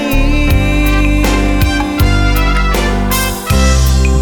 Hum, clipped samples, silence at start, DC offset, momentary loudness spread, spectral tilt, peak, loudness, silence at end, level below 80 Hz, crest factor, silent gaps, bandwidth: none; under 0.1%; 0 s; under 0.1%; 2 LU; -5 dB/octave; 0 dBFS; -12 LUFS; 0 s; -12 dBFS; 10 dB; none; 19.5 kHz